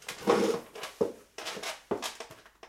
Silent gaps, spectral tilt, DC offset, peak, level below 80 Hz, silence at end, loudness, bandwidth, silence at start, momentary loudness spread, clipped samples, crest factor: none; -3.5 dB/octave; under 0.1%; -10 dBFS; -68 dBFS; 0 s; -33 LUFS; 16.5 kHz; 0 s; 15 LU; under 0.1%; 24 dB